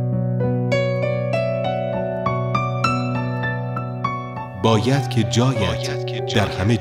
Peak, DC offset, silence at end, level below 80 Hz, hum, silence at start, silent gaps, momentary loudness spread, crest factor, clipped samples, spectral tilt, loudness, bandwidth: -2 dBFS; under 0.1%; 0 s; -46 dBFS; none; 0 s; none; 7 LU; 18 dB; under 0.1%; -6 dB/octave; -21 LUFS; 11.5 kHz